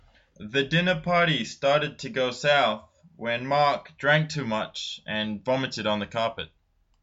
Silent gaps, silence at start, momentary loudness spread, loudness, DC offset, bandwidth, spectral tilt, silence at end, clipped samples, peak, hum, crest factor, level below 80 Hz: none; 0.4 s; 10 LU; -25 LUFS; under 0.1%; 8 kHz; -5 dB/octave; 0.55 s; under 0.1%; -8 dBFS; none; 18 dB; -60 dBFS